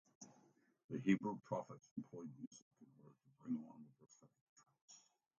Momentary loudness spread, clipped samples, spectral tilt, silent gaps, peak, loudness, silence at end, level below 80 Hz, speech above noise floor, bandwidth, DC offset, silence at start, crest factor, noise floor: 25 LU; under 0.1%; -7 dB/octave; 0.84-0.89 s, 1.91-1.96 s, 2.47-2.51 s, 2.62-2.71 s, 4.41-4.56 s, 4.82-4.88 s; -24 dBFS; -45 LUFS; 0.4 s; -88 dBFS; 30 dB; 7.4 kHz; under 0.1%; 0.2 s; 26 dB; -75 dBFS